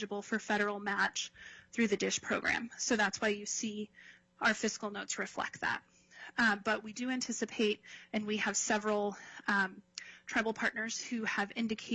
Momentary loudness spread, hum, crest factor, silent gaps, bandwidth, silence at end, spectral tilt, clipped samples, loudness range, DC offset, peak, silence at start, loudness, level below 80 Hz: 10 LU; none; 18 dB; none; 8.4 kHz; 0 s; -2.5 dB/octave; under 0.1%; 2 LU; under 0.1%; -18 dBFS; 0 s; -34 LUFS; -72 dBFS